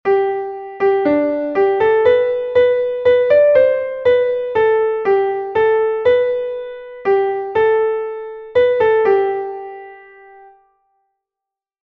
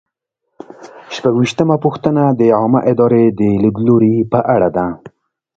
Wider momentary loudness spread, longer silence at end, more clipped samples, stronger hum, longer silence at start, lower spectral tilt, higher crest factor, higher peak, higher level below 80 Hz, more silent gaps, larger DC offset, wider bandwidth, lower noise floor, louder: first, 12 LU vs 7 LU; first, 1.85 s vs 0.5 s; neither; neither; second, 0.05 s vs 0.8 s; about the same, -7 dB/octave vs -8 dB/octave; about the same, 14 dB vs 14 dB; about the same, -2 dBFS vs 0 dBFS; second, -54 dBFS vs -48 dBFS; neither; neither; second, 5.2 kHz vs 7.8 kHz; first, -86 dBFS vs -73 dBFS; about the same, -15 LUFS vs -13 LUFS